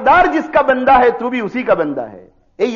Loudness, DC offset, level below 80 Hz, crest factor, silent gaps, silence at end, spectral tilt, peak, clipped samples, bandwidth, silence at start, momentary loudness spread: -14 LUFS; under 0.1%; -42 dBFS; 14 dB; none; 0 s; -3 dB/octave; -2 dBFS; under 0.1%; 7.2 kHz; 0 s; 10 LU